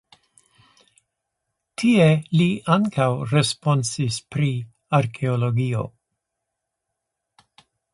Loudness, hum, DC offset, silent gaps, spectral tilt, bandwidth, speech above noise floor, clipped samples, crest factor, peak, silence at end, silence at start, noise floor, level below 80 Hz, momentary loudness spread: -21 LUFS; none; under 0.1%; none; -6 dB/octave; 11.5 kHz; 61 dB; under 0.1%; 20 dB; -2 dBFS; 2.05 s; 1.8 s; -81 dBFS; -58 dBFS; 9 LU